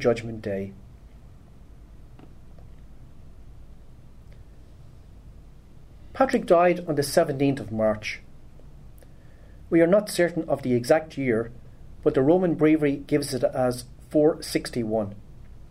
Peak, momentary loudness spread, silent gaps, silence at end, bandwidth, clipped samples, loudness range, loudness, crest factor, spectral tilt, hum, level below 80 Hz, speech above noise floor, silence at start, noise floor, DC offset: -6 dBFS; 13 LU; none; 0 s; 16 kHz; under 0.1%; 5 LU; -24 LUFS; 20 dB; -6 dB/octave; none; -48 dBFS; 24 dB; 0 s; -47 dBFS; under 0.1%